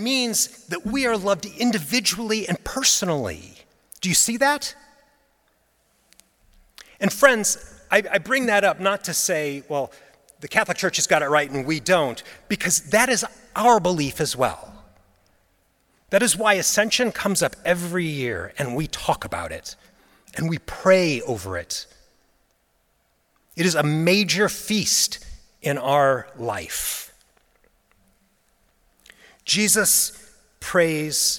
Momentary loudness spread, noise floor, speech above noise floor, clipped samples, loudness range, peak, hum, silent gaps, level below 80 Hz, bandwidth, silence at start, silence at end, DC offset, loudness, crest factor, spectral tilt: 12 LU; -66 dBFS; 45 dB; under 0.1%; 5 LU; 0 dBFS; none; none; -52 dBFS; 18 kHz; 0 s; 0 s; under 0.1%; -21 LUFS; 24 dB; -2.5 dB/octave